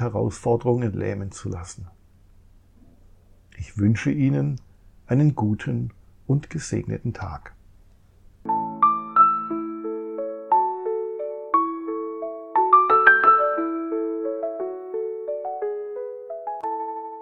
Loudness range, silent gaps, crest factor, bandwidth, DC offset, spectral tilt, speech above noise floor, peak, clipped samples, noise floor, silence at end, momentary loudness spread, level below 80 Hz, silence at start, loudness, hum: 10 LU; none; 24 dB; 10 kHz; under 0.1%; -7 dB/octave; 29 dB; 0 dBFS; under 0.1%; -52 dBFS; 0 s; 17 LU; -52 dBFS; 0 s; -23 LUFS; none